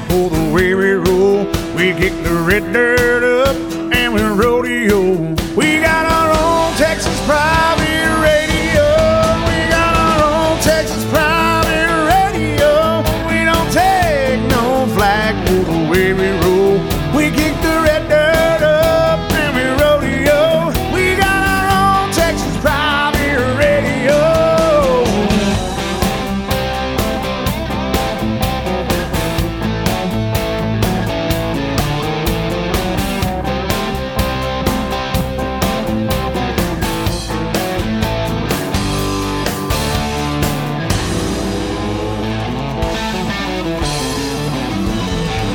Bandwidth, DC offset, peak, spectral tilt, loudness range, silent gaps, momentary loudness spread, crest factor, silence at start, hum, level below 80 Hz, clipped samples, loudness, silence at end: over 20 kHz; under 0.1%; 0 dBFS; -5 dB/octave; 5 LU; none; 7 LU; 14 dB; 0 s; none; -26 dBFS; under 0.1%; -15 LUFS; 0 s